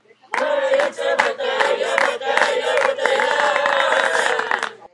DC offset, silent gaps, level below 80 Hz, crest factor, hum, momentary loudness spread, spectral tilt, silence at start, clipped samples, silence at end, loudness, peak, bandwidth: under 0.1%; none; -74 dBFS; 20 dB; none; 4 LU; -0.5 dB/octave; 0.3 s; under 0.1%; 0.05 s; -18 LUFS; 0 dBFS; 11.5 kHz